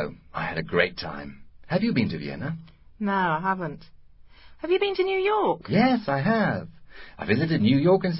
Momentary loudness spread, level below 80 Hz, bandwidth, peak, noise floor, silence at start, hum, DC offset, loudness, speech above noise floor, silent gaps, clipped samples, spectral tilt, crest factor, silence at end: 14 LU; -54 dBFS; 5.8 kHz; -4 dBFS; -49 dBFS; 0 s; none; under 0.1%; -25 LUFS; 25 dB; none; under 0.1%; -11 dB/octave; 20 dB; 0 s